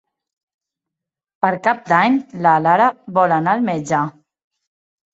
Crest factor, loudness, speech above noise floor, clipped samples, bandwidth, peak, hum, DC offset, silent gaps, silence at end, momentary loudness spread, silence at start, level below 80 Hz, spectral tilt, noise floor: 18 dB; -17 LUFS; 68 dB; under 0.1%; 8.2 kHz; -2 dBFS; none; under 0.1%; none; 1.05 s; 7 LU; 1.45 s; -64 dBFS; -6.5 dB/octave; -84 dBFS